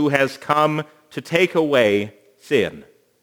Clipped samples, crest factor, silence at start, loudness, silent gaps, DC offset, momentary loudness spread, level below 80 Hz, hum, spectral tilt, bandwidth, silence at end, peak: under 0.1%; 20 dB; 0 s; -19 LUFS; none; under 0.1%; 14 LU; -64 dBFS; none; -5.5 dB/octave; over 20 kHz; 0.4 s; 0 dBFS